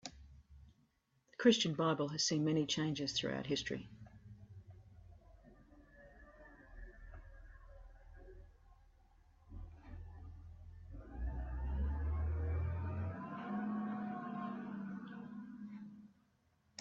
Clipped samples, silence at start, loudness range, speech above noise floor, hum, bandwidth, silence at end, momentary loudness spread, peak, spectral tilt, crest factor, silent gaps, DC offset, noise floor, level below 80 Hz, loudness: under 0.1%; 0.05 s; 24 LU; 41 dB; none; 7.6 kHz; 0.75 s; 26 LU; -16 dBFS; -4.5 dB/octave; 26 dB; none; under 0.1%; -77 dBFS; -52 dBFS; -39 LUFS